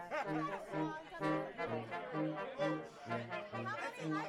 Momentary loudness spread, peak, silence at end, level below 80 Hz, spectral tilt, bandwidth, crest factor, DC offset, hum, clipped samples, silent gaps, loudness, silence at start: 4 LU; -24 dBFS; 0 s; -74 dBFS; -6.5 dB/octave; 12.5 kHz; 16 dB; under 0.1%; none; under 0.1%; none; -41 LUFS; 0 s